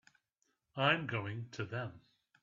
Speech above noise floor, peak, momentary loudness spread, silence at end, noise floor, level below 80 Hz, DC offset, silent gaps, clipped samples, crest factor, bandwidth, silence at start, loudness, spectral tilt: 45 dB; -16 dBFS; 14 LU; 0.45 s; -82 dBFS; -76 dBFS; under 0.1%; none; under 0.1%; 24 dB; 7.4 kHz; 0.75 s; -36 LUFS; -3 dB/octave